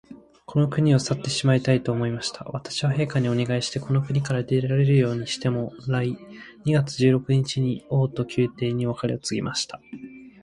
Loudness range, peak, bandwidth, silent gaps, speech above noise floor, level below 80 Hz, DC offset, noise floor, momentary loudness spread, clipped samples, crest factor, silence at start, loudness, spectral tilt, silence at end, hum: 1 LU; -6 dBFS; 11 kHz; none; 21 dB; -56 dBFS; under 0.1%; -44 dBFS; 10 LU; under 0.1%; 16 dB; 0.1 s; -24 LUFS; -6 dB/octave; 0.15 s; none